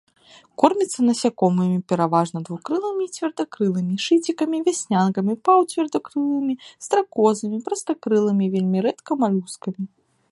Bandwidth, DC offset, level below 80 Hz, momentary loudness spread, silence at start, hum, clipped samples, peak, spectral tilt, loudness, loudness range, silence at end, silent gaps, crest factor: 11.5 kHz; under 0.1%; -68 dBFS; 8 LU; 0.6 s; none; under 0.1%; 0 dBFS; -6 dB/octave; -22 LUFS; 2 LU; 0.45 s; none; 20 dB